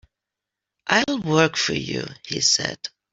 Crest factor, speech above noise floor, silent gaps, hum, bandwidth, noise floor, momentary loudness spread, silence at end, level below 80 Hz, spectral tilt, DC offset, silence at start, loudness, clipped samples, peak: 22 dB; 63 dB; none; none; 8.2 kHz; -86 dBFS; 11 LU; 0.25 s; -58 dBFS; -3 dB/octave; under 0.1%; 0.85 s; -21 LUFS; under 0.1%; -2 dBFS